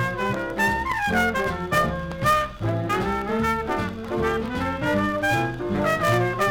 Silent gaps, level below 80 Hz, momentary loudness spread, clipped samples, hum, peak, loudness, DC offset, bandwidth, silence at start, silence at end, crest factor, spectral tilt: none; -42 dBFS; 5 LU; under 0.1%; none; -6 dBFS; -23 LUFS; under 0.1%; 19.5 kHz; 0 s; 0 s; 18 dB; -5.5 dB/octave